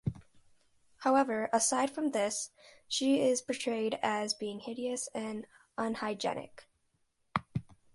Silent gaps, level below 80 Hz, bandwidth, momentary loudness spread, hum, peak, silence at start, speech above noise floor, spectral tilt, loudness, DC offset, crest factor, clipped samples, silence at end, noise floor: none; -64 dBFS; 11.5 kHz; 13 LU; none; -12 dBFS; 0.05 s; 43 dB; -3.5 dB/octave; -33 LUFS; under 0.1%; 22 dB; under 0.1%; 0.3 s; -76 dBFS